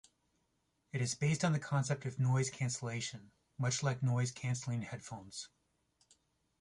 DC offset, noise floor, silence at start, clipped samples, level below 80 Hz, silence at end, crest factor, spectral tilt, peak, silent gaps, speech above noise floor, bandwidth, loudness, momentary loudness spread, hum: under 0.1%; -80 dBFS; 0.95 s; under 0.1%; -70 dBFS; 1.15 s; 18 dB; -5 dB/octave; -20 dBFS; none; 44 dB; 11.5 kHz; -37 LUFS; 14 LU; none